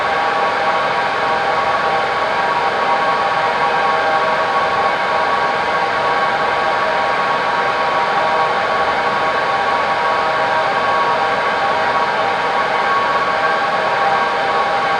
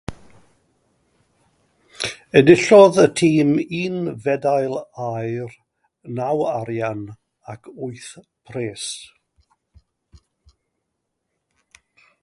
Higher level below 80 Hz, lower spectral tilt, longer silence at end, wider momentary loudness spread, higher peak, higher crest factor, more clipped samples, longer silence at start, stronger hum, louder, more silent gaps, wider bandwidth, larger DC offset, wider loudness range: about the same, -52 dBFS vs -56 dBFS; second, -3.5 dB/octave vs -5.5 dB/octave; second, 0 s vs 3.2 s; second, 1 LU vs 25 LU; about the same, -2 dBFS vs 0 dBFS; second, 12 dB vs 20 dB; neither; about the same, 0 s vs 0.1 s; neither; about the same, -16 LUFS vs -18 LUFS; neither; about the same, 12 kHz vs 11.5 kHz; neither; second, 0 LU vs 19 LU